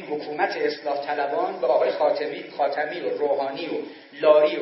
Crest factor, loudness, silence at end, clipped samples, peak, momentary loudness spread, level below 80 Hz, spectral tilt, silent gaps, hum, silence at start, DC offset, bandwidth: 18 dB; -24 LUFS; 0 s; under 0.1%; -4 dBFS; 12 LU; -86 dBFS; -7 dB/octave; none; none; 0 s; under 0.1%; 6 kHz